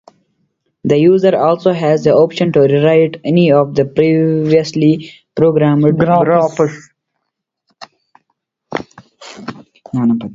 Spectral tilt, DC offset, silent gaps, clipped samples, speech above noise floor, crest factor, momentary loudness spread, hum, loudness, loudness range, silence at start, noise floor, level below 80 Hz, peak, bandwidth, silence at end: -8 dB/octave; under 0.1%; none; under 0.1%; 63 dB; 14 dB; 15 LU; none; -12 LUFS; 12 LU; 0.85 s; -74 dBFS; -52 dBFS; 0 dBFS; 7.6 kHz; 0 s